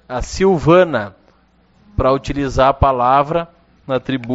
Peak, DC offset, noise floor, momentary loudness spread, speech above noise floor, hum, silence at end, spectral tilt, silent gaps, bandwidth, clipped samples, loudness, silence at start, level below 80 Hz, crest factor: 0 dBFS; under 0.1%; -54 dBFS; 12 LU; 39 dB; none; 0 s; -5.5 dB/octave; none; 8 kHz; under 0.1%; -15 LUFS; 0.1 s; -30 dBFS; 16 dB